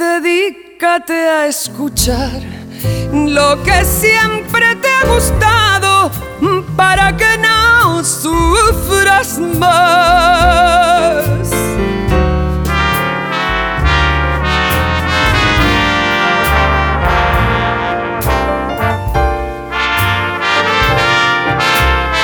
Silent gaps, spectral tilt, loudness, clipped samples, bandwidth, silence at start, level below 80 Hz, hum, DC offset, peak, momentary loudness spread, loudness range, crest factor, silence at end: none; -4 dB/octave; -11 LUFS; under 0.1%; over 20 kHz; 0 s; -22 dBFS; none; under 0.1%; 0 dBFS; 7 LU; 4 LU; 12 dB; 0 s